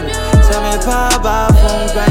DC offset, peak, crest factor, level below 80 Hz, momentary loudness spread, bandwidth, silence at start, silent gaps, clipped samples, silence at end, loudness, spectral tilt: under 0.1%; 0 dBFS; 10 dB; -14 dBFS; 4 LU; 16.5 kHz; 0 s; none; under 0.1%; 0 s; -12 LUFS; -5 dB/octave